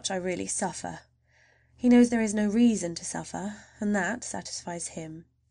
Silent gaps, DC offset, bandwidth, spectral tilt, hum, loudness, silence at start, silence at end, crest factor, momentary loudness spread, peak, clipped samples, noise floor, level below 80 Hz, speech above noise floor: none; under 0.1%; 10.5 kHz; -4.5 dB/octave; none; -27 LUFS; 0.05 s; 0.3 s; 18 dB; 18 LU; -10 dBFS; under 0.1%; -64 dBFS; -60 dBFS; 37 dB